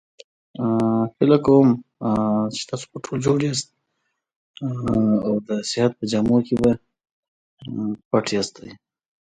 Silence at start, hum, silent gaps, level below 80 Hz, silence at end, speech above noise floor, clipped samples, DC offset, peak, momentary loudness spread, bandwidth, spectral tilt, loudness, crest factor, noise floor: 0.6 s; none; 4.36-4.54 s, 7.11-7.57 s, 8.05-8.11 s; -52 dBFS; 0.6 s; 55 dB; under 0.1%; under 0.1%; -2 dBFS; 13 LU; 9.4 kHz; -6 dB/octave; -21 LUFS; 20 dB; -75 dBFS